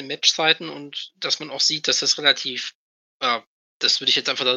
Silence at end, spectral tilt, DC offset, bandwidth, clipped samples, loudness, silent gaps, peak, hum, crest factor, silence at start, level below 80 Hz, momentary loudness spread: 0 s; -0.5 dB/octave; under 0.1%; 15.5 kHz; under 0.1%; -20 LUFS; 2.75-3.20 s, 3.47-3.80 s; -2 dBFS; none; 22 dB; 0 s; -82 dBFS; 13 LU